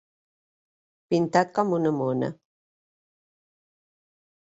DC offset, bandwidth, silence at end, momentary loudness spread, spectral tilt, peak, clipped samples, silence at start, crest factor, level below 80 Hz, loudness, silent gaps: under 0.1%; 8 kHz; 2.15 s; 6 LU; -7 dB/octave; -6 dBFS; under 0.1%; 1.1 s; 24 dB; -70 dBFS; -25 LUFS; none